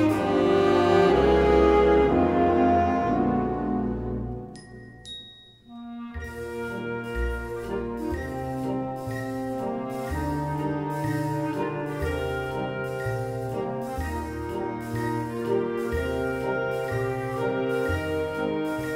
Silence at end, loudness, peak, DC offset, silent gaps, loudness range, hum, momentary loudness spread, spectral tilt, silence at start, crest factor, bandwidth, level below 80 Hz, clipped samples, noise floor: 0 s; -26 LUFS; -8 dBFS; under 0.1%; none; 12 LU; none; 16 LU; -7 dB/octave; 0 s; 18 dB; 16 kHz; -40 dBFS; under 0.1%; -48 dBFS